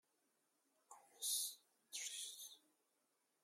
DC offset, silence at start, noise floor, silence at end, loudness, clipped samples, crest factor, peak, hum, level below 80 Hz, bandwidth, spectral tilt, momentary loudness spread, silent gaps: under 0.1%; 0.9 s; -85 dBFS; 0.85 s; -45 LUFS; under 0.1%; 22 dB; -30 dBFS; none; under -90 dBFS; 16 kHz; 5 dB/octave; 24 LU; none